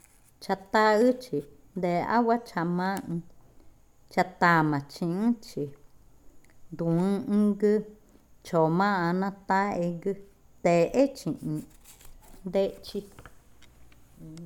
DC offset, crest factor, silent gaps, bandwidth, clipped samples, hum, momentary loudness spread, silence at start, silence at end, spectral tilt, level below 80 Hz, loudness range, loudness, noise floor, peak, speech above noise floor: under 0.1%; 20 dB; none; 17.5 kHz; under 0.1%; none; 15 LU; 0.4 s; 0 s; -7 dB/octave; -58 dBFS; 3 LU; -27 LUFS; -54 dBFS; -8 dBFS; 28 dB